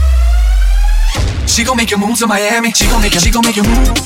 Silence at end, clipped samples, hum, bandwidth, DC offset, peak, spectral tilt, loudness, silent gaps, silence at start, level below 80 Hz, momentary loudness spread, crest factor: 0 s; under 0.1%; none; 16.5 kHz; under 0.1%; 0 dBFS; -3.5 dB/octave; -12 LUFS; none; 0 s; -12 dBFS; 4 LU; 10 dB